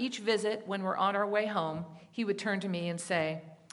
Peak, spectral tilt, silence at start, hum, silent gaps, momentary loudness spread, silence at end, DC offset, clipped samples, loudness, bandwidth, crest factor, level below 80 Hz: -14 dBFS; -5 dB/octave; 0 s; none; none; 7 LU; 0.2 s; under 0.1%; under 0.1%; -32 LUFS; 11.5 kHz; 18 dB; -76 dBFS